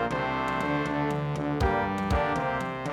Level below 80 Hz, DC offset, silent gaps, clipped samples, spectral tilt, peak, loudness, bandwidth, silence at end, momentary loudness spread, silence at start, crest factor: -40 dBFS; under 0.1%; none; under 0.1%; -6.5 dB/octave; -12 dBFS; -28 LUFS; 14 kHz; 0 s; 3 LU; 0 s; 16 dB